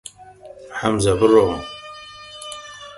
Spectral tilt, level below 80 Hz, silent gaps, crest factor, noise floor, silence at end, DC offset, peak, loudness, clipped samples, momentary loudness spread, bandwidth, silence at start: -5 dB/octave; -44 dBFS; none; 20 dB; -42 dBFS; 0 s; under 0.1%; -2 dBFS; -18 LUFS; under 0.1%; 22 LU; 11.5 kHz; 0.45 s